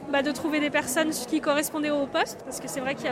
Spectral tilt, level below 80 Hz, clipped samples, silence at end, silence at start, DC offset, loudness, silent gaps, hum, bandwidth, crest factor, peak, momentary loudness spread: -3 dB/octave; -62 dBFS; under 0.1%; 0 s; 0 s; under 0.1%; -27 LUFS; none; none; 16 kHz; 16 dB; -10 dBFS; 6 LU